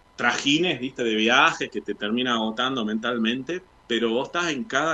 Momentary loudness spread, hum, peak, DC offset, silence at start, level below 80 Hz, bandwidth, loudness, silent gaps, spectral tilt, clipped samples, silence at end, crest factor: 11 LU; none; -4 dBFS; under 0.1%; 0.2 s; -62 dBFS; 8.6 kHz; -23 LUFS; none; -3.5 dB/octave; under 0.1%; 0 s; 20 dB